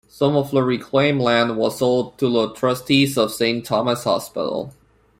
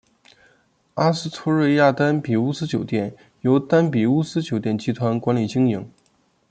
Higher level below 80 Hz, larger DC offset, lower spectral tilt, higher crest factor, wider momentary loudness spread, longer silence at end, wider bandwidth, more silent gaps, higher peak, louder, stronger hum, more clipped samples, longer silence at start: first, -56 dBFS vs -62 dBFS; neither; second, -5.5 dB/octave vs -7 dB/octave; about the same, 16 dB vs 18 dB; about the same, 6 LU vs 8 LU; second, 0.5 s vs 0.65 s; first, 16.5 kHz vs 9.2 kHz; neither; about the same, -4 dBFS vs -4 dBFS; about the same, -19 LUFS vs -21 LUFS; neither; neither; second, 0.15 s vs 0.95 s